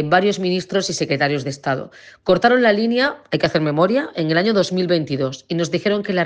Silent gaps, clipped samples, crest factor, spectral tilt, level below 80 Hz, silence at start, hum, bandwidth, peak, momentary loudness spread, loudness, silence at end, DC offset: none; under 0.1%; 16 dB; -5 dB/octave; -56 dBFS; 0 s; none; 9.8 kHz; -2 dBFS; 8 LU; -19 LUFS; 0 s; under 0.1%